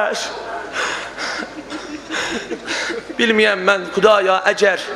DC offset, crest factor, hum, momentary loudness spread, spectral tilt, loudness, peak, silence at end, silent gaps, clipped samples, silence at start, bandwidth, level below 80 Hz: under 0.1%; 18 dB; none; 14 LU; -3 dB/octave; -18 LUFS; 0 dBFS; 0 s; none; under 0.1%; 0 s; 13 kHz; -54 dBFS